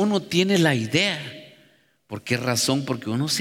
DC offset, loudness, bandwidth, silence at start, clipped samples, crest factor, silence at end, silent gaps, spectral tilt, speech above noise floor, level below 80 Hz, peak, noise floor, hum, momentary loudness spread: under 0.1%; -22 LUFS; 17 kHz; 0 s; under 0.1%; 18 dB; 0 s; none; -4 dB/octave; 37 dB; -64 dBFS; -6 dBFS; -59 dBFS; none; 17 LU